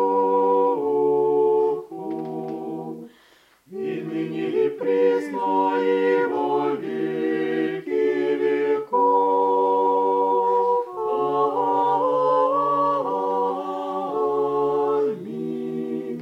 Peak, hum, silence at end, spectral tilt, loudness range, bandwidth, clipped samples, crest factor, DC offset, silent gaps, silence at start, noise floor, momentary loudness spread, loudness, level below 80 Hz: -8 dBFS; none; 0 s; -7.5 dB/octave; 5 LU; 7.6 kHz; under 0.1%; 14 dB; under 0.1%; none; 0 s; -56 dBFS; 10 LU; -22 LUFS; -78 dBFS